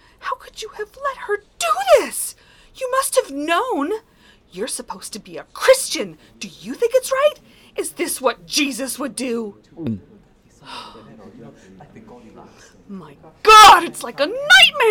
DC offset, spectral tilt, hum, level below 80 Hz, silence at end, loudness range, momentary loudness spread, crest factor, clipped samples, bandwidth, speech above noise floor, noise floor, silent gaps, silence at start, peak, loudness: under 0.1%; -1.5 dB/octave; none; -50 dBFS; 0 s; 18 LU; 24 LU; 16 dB; under 0.1%; over 20 kHz; 32 dB; -50 dBFS; none; 0.25 s; -2 dBFS; -16 LUFS